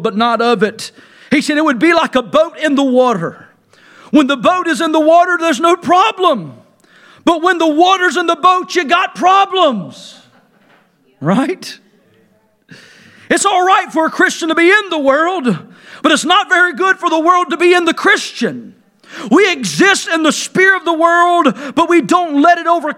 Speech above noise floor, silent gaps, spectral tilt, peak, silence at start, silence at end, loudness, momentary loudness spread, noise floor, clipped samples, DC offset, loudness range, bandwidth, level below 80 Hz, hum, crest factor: 42 dB; none; -3.5 dB/octave; 0 dBFS; 0 s; 0 s; -12 LUFS; 8 LU; -54 dBFS; under 0.1%; under 0.1%; 4 LU; 15 kHz; -60 dBFS; none; 12 dB